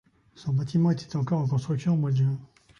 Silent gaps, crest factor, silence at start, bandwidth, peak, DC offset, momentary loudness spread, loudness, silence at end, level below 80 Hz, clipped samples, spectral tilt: none; 12 dB; 0.4 s; 7.2 kHz; -14 dBFS; under 0.1%; 5 LU; -26 LUFS; 0.35 s; -60 dBFS; under 0.1%; -8.5 dB/octave